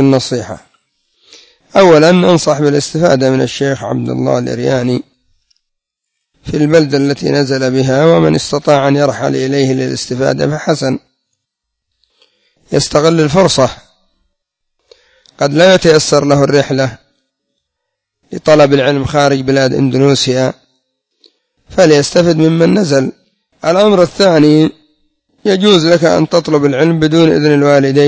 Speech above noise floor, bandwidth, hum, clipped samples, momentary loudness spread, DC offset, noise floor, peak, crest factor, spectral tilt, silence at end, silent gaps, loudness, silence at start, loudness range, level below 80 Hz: 65 dB; 8 kHz; none; 0.4%; 9 LU; under 0.1%; -74 dBFS; 0 dBFS; 12 dB; -5.5 dB/octave; 0 s; none; -10 LUFS; 0 s; 5 LU; -44 dBFS